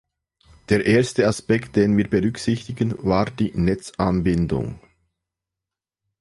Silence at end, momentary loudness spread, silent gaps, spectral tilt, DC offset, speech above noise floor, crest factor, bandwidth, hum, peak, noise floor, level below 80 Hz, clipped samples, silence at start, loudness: 1.45 s; 7 LU; none; -6.5 dB/octave; under 0.1%; 67 dB; 18 dB; 11.5 kHz; none; -4 dBFS; -87 dBFS; -42 dBFS; under 0.1%; 0.7 s; -21 LUFS